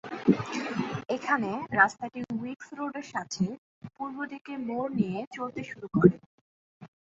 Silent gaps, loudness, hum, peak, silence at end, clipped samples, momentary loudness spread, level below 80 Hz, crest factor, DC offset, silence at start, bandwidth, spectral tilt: 3.58-3.81 s, 4.41-4.45 s, 5.27-5.31 s, 6.26-6.80 s; -30 LUFS; none; -4 dBFS; 0.2 s; under 0.1%; 15 LU; -62 dBFS; 26 dB; under 0.1%; 0.05 s; 7.8 kHz; -6.5 dB/octave